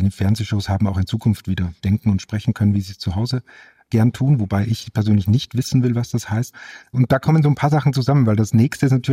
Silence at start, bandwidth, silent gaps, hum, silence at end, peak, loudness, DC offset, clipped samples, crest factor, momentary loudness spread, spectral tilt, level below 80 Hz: 0 s; 15.5 kHz; none; none; 0 s; -2 dBFS; -19 LUFS; under 0.1%; under 0.1%; 16 dB; 8 LU; -7 dB/octave; -50 dBFS